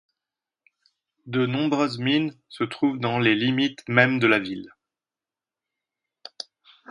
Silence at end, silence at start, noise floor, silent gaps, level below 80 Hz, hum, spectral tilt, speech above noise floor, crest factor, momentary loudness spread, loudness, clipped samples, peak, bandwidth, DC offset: 2.25 s; 1.25 s; under -90 dBFS; none; -68 dBFS; none; -6 dB/octave; over 67 dB; 26 dB; 18 LU; -23 LUFS; under 0.1%; 0 dBFS; 11 kHz; under 0.1%